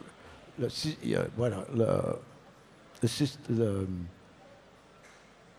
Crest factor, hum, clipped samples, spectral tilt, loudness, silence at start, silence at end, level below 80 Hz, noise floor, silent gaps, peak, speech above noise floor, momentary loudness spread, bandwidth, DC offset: 20 dB; none; under 0.1%; -6 dB/octave; -32 LUFS; 0 s; 0.5 s; -62 dBFS; -57 dBFS; none; -14 dBFS; 26 dB; 18 LU; 15.5 kHz; under 0.1%